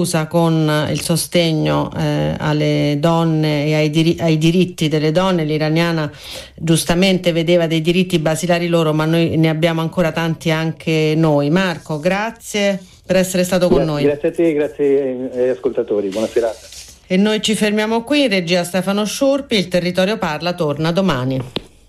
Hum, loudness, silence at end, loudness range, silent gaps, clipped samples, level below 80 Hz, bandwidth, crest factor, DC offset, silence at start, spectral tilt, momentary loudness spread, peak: none; -16 LUFS; 0.25 s; 2 LU; none; under 0.1%; -44 dBFS; 15 kHz; 14 dB; under 0.1%; 0 s; -5.5 dB/octave; 5 LU; -2 dBFS